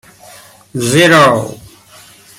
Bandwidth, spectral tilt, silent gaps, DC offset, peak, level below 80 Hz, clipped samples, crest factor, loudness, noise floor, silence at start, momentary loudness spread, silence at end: 17 kHz; -4.5 dB/octave; none; under 0.1%; 0 dBFS; -50 dBFS; under 0.1%; 14 dB; -9 LUFS; -41 dBFS; 0.75 s; 20 LU; 0.85 s